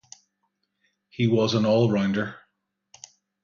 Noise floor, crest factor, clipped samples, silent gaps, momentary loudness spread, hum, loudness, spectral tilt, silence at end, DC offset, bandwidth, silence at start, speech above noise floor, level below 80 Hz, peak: -76 dBFS; 16 dB; under 0.1%; none; 12 LU; none; -23 LUFS; -6.5 dB/octave; 1.05 s; under 0.1%; 7.4 kHz; 1.2 s; 54 dB; -62 dBFS; -10 dBFS